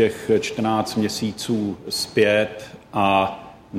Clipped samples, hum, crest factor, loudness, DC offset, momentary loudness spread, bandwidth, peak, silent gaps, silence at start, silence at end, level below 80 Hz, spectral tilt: under 0.1%; none; 16 dB; -22 LUFS; under 0.1%; 9 LU; 16 kHz; -6 dBFS; none; 0 s; 0 s; -56 dBFS; -4.5 dB/octave